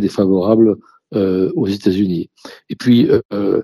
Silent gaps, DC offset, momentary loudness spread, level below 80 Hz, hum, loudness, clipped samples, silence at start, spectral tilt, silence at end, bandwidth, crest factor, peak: 3.25-3.29 s; under 0.1%; 12 LU; -54 dBFS; none; -15 LUFS; under 0.1%; 0 s; -8 dB/octave; 0 s; 13 kHz; 14 dB; 0 dBFS